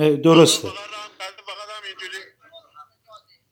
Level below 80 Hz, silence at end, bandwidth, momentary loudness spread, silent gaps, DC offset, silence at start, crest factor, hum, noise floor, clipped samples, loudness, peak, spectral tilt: -72 dBFS; 1.3 s; 17 kHz; 22 LU; none; under 0.1%; 0 s; 20 dB; none; -50 dBFS; under 0.1%; -15 LUFS; 0 dBFS; -4.5 dB/octave